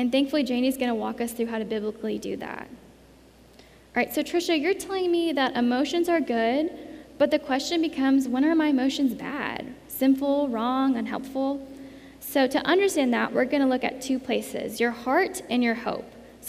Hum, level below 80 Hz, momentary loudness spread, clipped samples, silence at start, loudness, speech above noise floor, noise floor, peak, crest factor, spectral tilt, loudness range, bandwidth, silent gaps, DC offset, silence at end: none; -60 dBFS; 11 LU; under 0.1%; 0 s; -25 LUFS; 28 dB; -53 dBFS; -10 dBFS; 16 dB; -4 dB/octave; 5 LU; 15.5 kHz; none; under 0.1%; 0 s